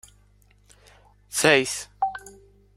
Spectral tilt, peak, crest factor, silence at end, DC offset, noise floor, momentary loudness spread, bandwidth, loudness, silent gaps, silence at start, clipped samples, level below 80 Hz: -2.5 dB/octave; -2 dBFS; 26 dB; 0.45 s; under 0.1%; -58 dBFS; 12 LU; 16 kHz; -22 LUFS; none; 1.3 s; under 0.1%; -58 dBFS